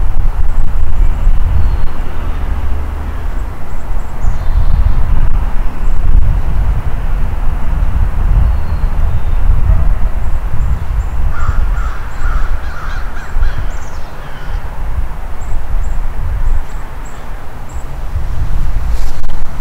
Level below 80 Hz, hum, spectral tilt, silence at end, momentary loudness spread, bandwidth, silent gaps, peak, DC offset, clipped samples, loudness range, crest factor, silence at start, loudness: -12 dBFS; none; -7 dB/octave; 0 s; 10 LU; 4.2 kHz; none; 0 dBFS; under 0.1%; 2%; 6 LU; 8 dB; 0 s; -19 LUFS